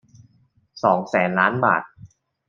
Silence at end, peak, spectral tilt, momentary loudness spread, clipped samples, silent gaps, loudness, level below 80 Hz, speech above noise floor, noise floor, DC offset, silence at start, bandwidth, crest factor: 0.4 s; -2 dBFS; -7 dB/octave; 5 LU; under 0.1%; none; -20 LUFS; -66 dBFS; 42 dB; -61 dBFS; under 0.1%; 0.75 s; 7.4 kHz; 20 dB